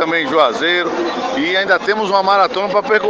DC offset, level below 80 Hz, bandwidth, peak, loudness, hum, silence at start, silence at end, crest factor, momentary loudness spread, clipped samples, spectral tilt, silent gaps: under 0.1%; -58 dBFS; 7.8 kHz; 0 dBFS; -15 LUFS; none; 0 s; 0 s; 14 dB; 5 LU; under 0.1%; -4 dB/octave; none